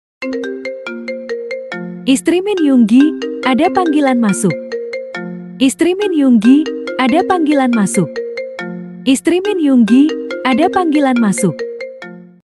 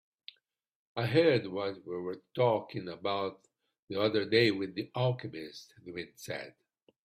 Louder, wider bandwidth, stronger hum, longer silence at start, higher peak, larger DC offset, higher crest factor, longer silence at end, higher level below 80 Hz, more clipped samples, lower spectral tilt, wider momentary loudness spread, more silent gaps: first, -14 LUFS vs -32 LUFS; second, 12.5 kHz vs 14 kHz; neither; second, 0.2 s vs 0.95 s; first, 0 dBFS vs -14 dBFS; neither; second, 14 dB vs 20 dB; second, 0.35 s vs 0.55 s; first, -58 dBFS vs -72 dBFS; neither; second, -5 dB/octave vs -6.5 dB/octave; second, 14 LU vs 18 LU; second, none vs 3.79-3.88 s